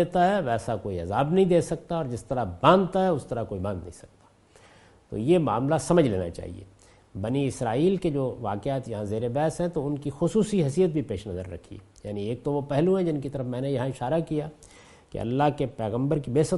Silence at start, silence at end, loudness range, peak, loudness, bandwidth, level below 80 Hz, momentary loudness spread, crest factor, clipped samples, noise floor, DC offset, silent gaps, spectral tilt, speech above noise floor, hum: 0 s; 0 s; 4 LU; -4 dBFS; -26 LUFS; 11.5 kHz; -52 dBFS; 13 LU; 22 dB; under 0.1%; -56 dBFS; under 0.1%; none; -7 dB/octave; 31 dB; none